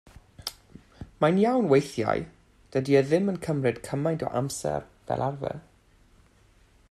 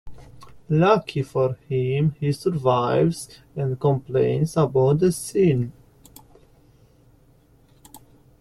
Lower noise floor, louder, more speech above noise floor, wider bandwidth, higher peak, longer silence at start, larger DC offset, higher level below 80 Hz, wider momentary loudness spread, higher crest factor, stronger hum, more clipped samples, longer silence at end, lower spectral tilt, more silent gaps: about the same, -59 dBFS vs -56 dBFS; second, -26 LUFS vs -22 LUFS; about the same, 34 dB vs 35 dB; about the same, 13.5 kHz vs 14 kHz; second, -8 dBFS vs -4 dBFS; first, 0.45 s vs 0.05 s; neither; about the same, -56 dBFS vs -52 dBFS; first, 16 LU vs 8 LU; about the same, 20 dB vs 20 dB; neither; neither; first, 1.3 s vs 0.45 s; about the same, -6.5 dB/octave vs -7 dB/octave; neither